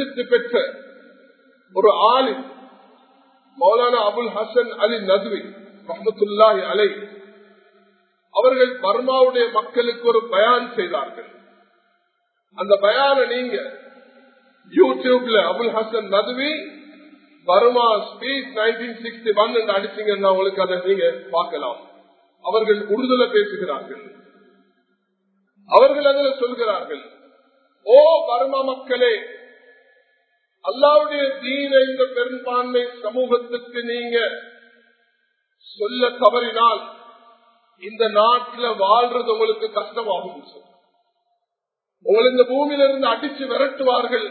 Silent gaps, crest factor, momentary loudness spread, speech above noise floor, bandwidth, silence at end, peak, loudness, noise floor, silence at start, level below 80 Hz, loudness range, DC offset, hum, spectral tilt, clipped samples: none; 20 dB; 13 LU; 64 dB; 4.5 kHz; 0 s; 0 dBFS; -19 LUFS; -83 dBFS; 0 s; -78 dBFS; 4 LU; under 0.1%; none; -7 dB/octave; under 0.1%